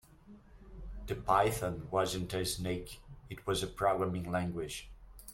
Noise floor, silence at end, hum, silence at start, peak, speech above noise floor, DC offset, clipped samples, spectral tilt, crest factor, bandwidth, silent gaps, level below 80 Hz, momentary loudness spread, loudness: -57 dBFS; 0 s; none; 0.25 s; -14 dBFS; 23 dB; under 0.1%; under 0.1%; -4.5 dB/octave; 22 dB; 16.5 kHz; none; -52 dBFS; 20 LU; -34 LUFS